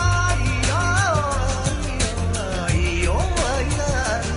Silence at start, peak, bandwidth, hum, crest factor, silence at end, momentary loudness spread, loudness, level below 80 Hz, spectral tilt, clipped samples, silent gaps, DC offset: 0 s; -8 dBFS; 11 kHz; none; 14 dB; 0 s; 5 LU; -21 LUFS; -26 dBFS; -4.5 dB/octave; under 0.1%; none; under 0.1%